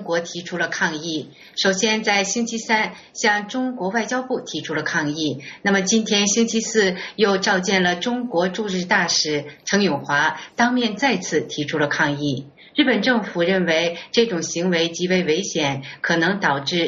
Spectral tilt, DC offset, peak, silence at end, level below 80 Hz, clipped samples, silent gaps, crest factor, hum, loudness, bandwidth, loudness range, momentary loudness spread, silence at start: -2.5 dB/octave; under 0.1%; -2 dBFS; 0 s; -62 dBFS; under 0.1%; none; 18 dB; none; -20 LUFS; 8 kHz; 2 LU; 7 LU; 0 s